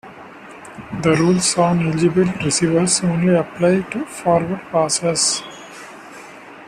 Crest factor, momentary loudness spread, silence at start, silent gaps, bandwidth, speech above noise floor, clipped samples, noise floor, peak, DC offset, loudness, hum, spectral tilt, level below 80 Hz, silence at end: 16 dB; 22 LU; 0.05 s; none; 13.5 kHz; 21 dB; under 0.1%; -38 dBFS; -2 dBFS; under 0.1%; -17 LUFS; none; -4.5 dB/octave; -52 dBFS; 0 s